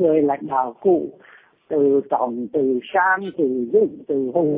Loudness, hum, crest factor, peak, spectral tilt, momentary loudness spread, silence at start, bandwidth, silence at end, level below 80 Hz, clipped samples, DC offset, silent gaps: -20 LUFS; none; 14 dB; -6 dBFS; -11 dB/octave; 5 LU; 0 s; 3.8 kHz; 0 s; -66 dBFS; under 0.1%; under 0.1%; none